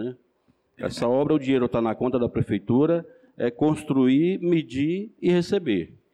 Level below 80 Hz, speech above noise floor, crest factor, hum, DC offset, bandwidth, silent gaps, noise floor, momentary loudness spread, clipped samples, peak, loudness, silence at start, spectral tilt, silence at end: -56 dBFS; 43 dB; 12 dB; none; under 0.1%; 11.5 kHz; none; -66 dBFS; 7 LU; under 0.1%; -12 dBFS; -24 LUFS; 0 s; -7.5 dB/octave; 0.3 s